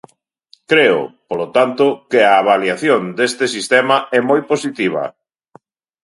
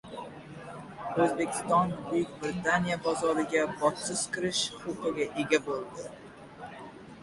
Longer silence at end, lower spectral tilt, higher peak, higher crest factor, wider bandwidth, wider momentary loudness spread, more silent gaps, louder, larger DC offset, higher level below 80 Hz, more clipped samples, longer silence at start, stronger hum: first, 0.95 s vs 0 s; about the same, -4 dB/octave vs -4 dB/octave; first, 0 dBFS vs -10 dBFS; second, 16 dB vs 22 dB; about the same, 11.5 kHz vs 11.5 kHz; second, 8 LU vs 17 LU; neither; first, -15 LUFS vs -30 LUFS; neither; about the same, -66 dBFS vs -62 dBFS; neither; first, 0.7 s vs 0.05 s; neither